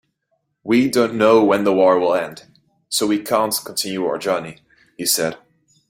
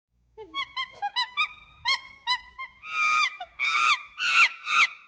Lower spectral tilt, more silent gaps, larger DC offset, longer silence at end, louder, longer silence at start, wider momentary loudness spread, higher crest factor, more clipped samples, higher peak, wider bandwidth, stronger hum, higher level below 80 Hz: first, -3.5 dB/octave vs 2 dB/octave; neither; neither; first, 0.55 s vs 0.15 s; first, -18 LUFS vs -24 LUFS; first, 0.65 s vs 0.4 s; about the same, 10 LU vs 12 LU; about the same, 18 dB vs 18 dB; neither; first, -2 dBFS vs -8 dBFS; first, 16.5 kHz vs 10 kHz; neither; about the same, -62 dBFS vs -66 dBFS